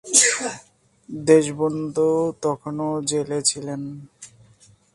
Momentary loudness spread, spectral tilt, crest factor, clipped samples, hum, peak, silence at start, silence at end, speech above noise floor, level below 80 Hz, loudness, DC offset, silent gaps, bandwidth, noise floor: 17 LU; -3 dB/octave; 22 dB; under 0.1%; none; -2 dBFS; 0.05 s; 0.7 s; 33 dB; -62 dBFS; -21 LUFS; under 0.1%; none; 11.5 kHz; -54 dBFS